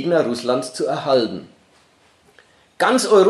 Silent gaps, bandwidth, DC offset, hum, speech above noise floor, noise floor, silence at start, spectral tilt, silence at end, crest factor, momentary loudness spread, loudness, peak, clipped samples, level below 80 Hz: none; 12.5 kHz; under 0.1%; none; 38 dB; -56 dBFS; 0 s; -4 dB/octave; 0 s; 16 dB; 7 LU; -19 LUFS; -2 dBFS; under 0.1%; -72 dBFS